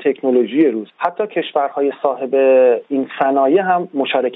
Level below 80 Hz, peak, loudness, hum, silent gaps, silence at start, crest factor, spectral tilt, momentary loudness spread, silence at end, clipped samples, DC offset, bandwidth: -76 dBFS; -2 dBFS; -16 LUFS; none; none; 0 s; 14 dB; -8.5 dB/octave; 8 LU; 0 s; under 0.1%; under 0.1%; 4 kHz